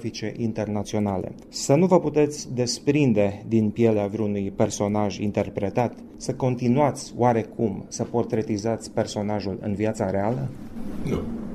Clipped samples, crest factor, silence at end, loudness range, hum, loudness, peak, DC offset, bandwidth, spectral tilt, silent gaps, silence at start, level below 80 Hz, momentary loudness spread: under 0.1%; 20 dB; 0 s; 5 LU; none; -24 LUFS; -4 dBFS; under 0.1%; 13.5 kHz; -6 dB/octave; none; 0 s; -50 dBFS; 10 LU